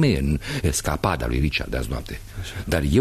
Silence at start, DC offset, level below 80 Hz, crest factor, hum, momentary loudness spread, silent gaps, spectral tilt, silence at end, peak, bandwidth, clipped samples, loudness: 0 s; under 0.1%; -30 dBFS; 18 dB; none; 12 LU; none; -5 dB/octave; 0 s; -4 dBFS; 14 kHz; under 0.1%; -24 LUFS